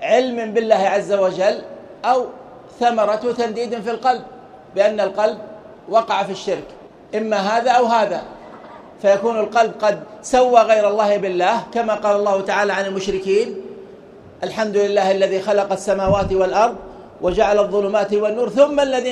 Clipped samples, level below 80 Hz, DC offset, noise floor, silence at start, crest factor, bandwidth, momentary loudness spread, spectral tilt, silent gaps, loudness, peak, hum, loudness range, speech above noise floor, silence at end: under 0.1%; -46 dBFS; under 0.1%; -41 dBFS; 0 s; 18 dB; 11 kHz; 13 LU; -4.5 dB/octave; none; -18 LUFS; 0 dBFS; none; 4 LU; 24 dB; 0 s